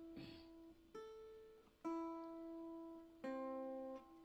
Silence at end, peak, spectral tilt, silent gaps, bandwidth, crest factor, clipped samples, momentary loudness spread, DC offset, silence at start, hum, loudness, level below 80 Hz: 0 s; -36 dBFS; -6.5 dB/octave; none; 15.5 kHz; 16 dB; under 0.1%; 13 LU; under 0.1%; 0 s; none; -52 LUFS; -78 dBFS